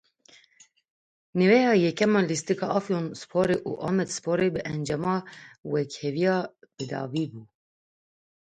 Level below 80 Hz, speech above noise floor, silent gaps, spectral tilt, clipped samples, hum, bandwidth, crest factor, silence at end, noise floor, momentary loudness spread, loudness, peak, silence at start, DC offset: -64 dBFS; 34 dB; 5.58-5.63 s; -5.5 dB/octave; under 0.1%; none; 9.6 kHz; 20 dB; 1.1 s; -60 dBFS; 12 LU; -26 LUFS; -6 dBFS; 1.35 s; under 0.1%